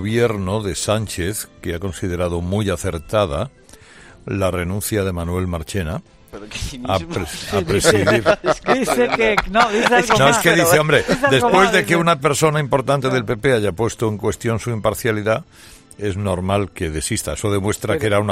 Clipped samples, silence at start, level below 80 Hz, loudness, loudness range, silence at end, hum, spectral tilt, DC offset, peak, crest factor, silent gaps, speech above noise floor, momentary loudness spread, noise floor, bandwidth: under 0.1%; 0 s; -40 dBFS; -18 LUFS; 9 LU; 0 s; none; -4.5 dB/octave; under 0.1%; 0 dBFS; 18 dB; none; 26 dB; 12 LU; -44 dBFS; 16 kHz